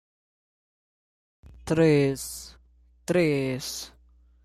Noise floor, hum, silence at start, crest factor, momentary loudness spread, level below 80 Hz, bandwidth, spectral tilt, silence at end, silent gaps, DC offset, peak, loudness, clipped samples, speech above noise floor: -59 dBFS; none; 1.65 s; 18 dB; 22 LU; -54 dBFS; 15 kHz; -5.5 dB/octave; 0.55 s; none; under 0.1%; -10 dBFS; -25 LUFS; under 0.1%; 35 dB